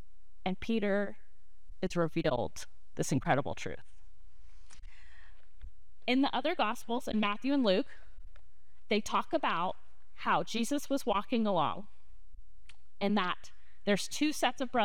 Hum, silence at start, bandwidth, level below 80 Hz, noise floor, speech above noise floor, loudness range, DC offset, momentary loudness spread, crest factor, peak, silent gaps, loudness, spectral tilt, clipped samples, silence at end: none; 0.45 s; 18.5 kHz; -56 dBFS; -65 dBFS; 33 dB; 5 LU; 1%; 10 LU; 20 dB; -14 dBFS; none; -33 LUFS; -4.5 dB/octave; under 0.1%; 0 s